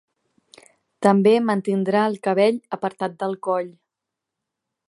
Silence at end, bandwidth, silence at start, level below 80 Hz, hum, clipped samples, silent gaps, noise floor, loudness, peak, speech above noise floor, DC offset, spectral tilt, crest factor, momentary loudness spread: 1.2 s; 11.5 kHz; 1 s; -76 dBFS; none; under 0.1%; none; -84 dBFS; -21 LUFS; -2 dBFS; 64 dB; under 0.1%; -7 dB/octave; 20 dB; 10 LU